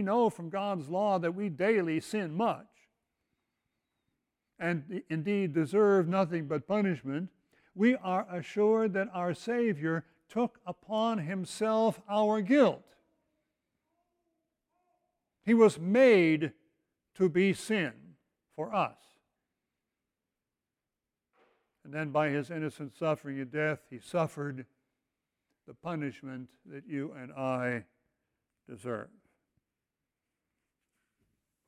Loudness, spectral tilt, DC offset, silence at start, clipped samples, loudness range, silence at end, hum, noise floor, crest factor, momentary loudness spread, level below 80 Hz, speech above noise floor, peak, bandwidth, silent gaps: -31 LUFS; -6.5 dB/octave; under 0.1%; 0 s; under 0.1%; 12 LU; 2.6 s; none; -90 dBFS; 20 dB; 15 LU; -76 dBFS; 60 dB; -12 dBFS; 14 kHz; none